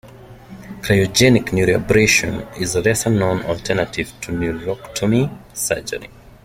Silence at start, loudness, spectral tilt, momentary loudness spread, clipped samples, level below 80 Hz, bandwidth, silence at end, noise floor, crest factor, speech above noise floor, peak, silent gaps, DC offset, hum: 0.05 s; -18 LUFS; -4.5 dB/octave; 13 LU; under 0.1%; -42 dBFS; 16.5 kHz; 0.4 s; -40 dBFS; 18 dB; 22 dB; -2 dBFS; none; under 0.1%; none